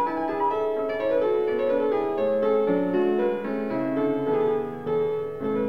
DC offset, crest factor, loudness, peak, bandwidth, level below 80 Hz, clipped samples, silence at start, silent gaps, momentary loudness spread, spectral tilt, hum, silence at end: 0.4%; 12 dB; -25 LUFS; -12 dBFS; 5.4 kHz; -64 dBFS; under 0.1%; 0 s; none; 5 LU; -8.5 dB/octave; none; 0 s